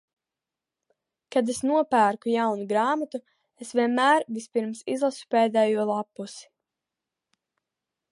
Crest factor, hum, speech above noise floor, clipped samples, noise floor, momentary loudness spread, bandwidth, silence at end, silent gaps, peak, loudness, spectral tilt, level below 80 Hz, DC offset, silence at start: 20 dB; none; 64 dB; under 0.1%; -89 dBFS; 15 LU; 11.5 kHz; 1.7 s; none; -8 dBFS; -25 LUFS; -4.5 dB/octave; -76 dBFS; under 0.1%; 1.3 s